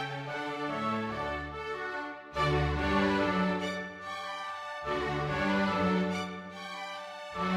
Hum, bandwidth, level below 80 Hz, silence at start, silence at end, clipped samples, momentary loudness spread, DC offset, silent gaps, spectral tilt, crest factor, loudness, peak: none; 12.5 kHz; -48 dBFS; 0 s; 0 s; under 0.1%; 11 LU; under 0.1%; none; -6 dB/octave; 18 dB; -32 LUFS; -14 dBFS